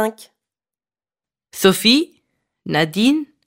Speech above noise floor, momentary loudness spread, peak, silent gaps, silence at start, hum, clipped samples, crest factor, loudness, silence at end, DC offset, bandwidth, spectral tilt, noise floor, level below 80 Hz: over 73 dB; 18 LU; 0 dBFS; none; 0 s; none; under 0.1%; 20 dB; -16 LUFS; 0.25 s; under 0.1%; 16.5 kHz; -4 dB/octave; under -90 dBFS; -64 dBFS